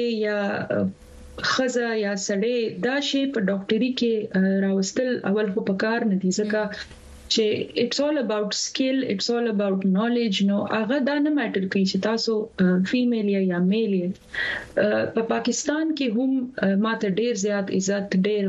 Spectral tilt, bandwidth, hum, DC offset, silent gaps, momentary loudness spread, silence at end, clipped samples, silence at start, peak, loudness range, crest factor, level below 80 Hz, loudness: -5 dB/octave; 8 kHz; none; under 0.1%; none; 3 LU; 0 s; under 0.1%; 0 s; -8 dBFS; 2 LU; 14 dB; -58 dBFS; -23 LUFS